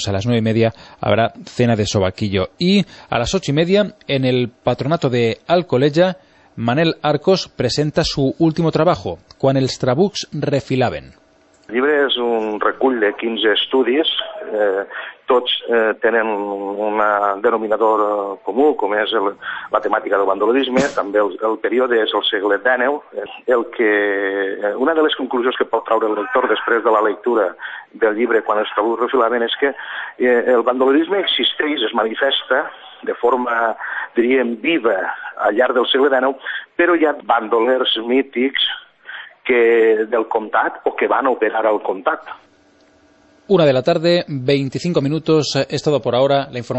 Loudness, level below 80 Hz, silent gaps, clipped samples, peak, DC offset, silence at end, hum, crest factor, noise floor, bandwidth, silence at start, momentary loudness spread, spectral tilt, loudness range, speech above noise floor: -17 LUFS; -50 dBFS; none; under 0.1%; -2 dBFS; under 0.1%; 0 s; none; 16 dB; -53 dBFS; 8.4 kHz; 0 s; 6 LU; -5.5 dB/octave; 2 LU; 36 dB